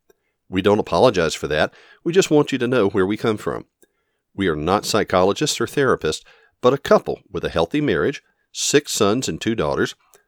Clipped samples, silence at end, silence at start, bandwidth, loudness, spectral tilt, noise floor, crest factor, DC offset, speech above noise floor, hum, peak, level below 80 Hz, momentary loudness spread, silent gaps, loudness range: under 0.1%; 0.35 s; 0.5 s; 19.5 kHz; -20 LUFS; -4.5 dB/octave; -71 dBFS; 20 dB; under 0.1%; 51 dB; none; 0 dBFS; -48 dBFS; 10 LU; none; 2 LU